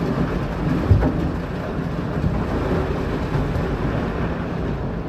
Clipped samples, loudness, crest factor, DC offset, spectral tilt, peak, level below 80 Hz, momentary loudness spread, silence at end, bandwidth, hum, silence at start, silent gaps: under 0.1%; -23 LUFS; 18 dB; under 0.1%; -8.5 dB/octave; -2 dBFS; -30 dBFS; 7 LU; 0 s; 13.5 kHz; none; 0 s; none